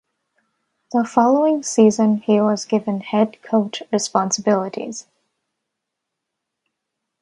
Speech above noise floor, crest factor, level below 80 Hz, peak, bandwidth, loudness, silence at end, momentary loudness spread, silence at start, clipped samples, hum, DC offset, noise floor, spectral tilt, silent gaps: 63 dB; 20 dB; -68 dBFS; 0 dBFS; 11 kHz; -18 LUFS; 2.2 s; 8 LU; 0.95 s; under 0.1%; none; under 0.1%; -80 dBFS; -5 dB/octave; none